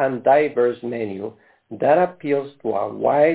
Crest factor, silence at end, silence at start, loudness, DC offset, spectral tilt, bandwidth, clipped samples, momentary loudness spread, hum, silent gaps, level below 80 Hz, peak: 16 dB; 0 s; 0 s; -20 LUFS; under 0.1%; -10.5 dB/octave; 4 kHz; under 0.1%; 12 LU; none; none; -66 dBFS; -4 dBFS